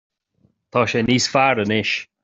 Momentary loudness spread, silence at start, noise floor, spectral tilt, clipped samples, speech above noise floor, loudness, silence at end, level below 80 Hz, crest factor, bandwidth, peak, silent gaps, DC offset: 6 LU; 0.75 s; -63 dBFS; -4 dB/octave; under 0.1%; 44 dB; -18 LUFS; 0.2 s; -54 dBFS; 18 dB; 8.2 kHz; -2 dBFS; none; under 0.1%